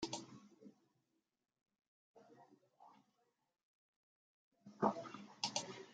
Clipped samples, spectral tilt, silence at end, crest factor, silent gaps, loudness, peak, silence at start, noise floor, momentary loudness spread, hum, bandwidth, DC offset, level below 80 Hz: under 0.1%; -3 dB/octave; 0 s; 28 dB; 1.88-2.14 s, 3.63-4.52 s; -43 LUFS; -22 dBFS; 0 s; -86 dBFS; 25 LU; none; 9 kHz; under 0.1%; -88 dBFS